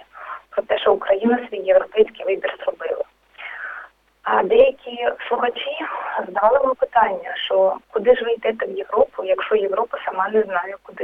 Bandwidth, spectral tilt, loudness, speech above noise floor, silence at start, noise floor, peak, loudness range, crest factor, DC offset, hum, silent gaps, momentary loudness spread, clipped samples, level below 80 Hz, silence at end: 4 kHz; -6.5 dB/octave; -20 LUFS; 22 dB; 0.15 s; -41 dBFS; -2 dBFS; 3 LU; 18 dB; under 0.1%; none; none; 14 LU; under 0.1%; -56 dBFS; 0 s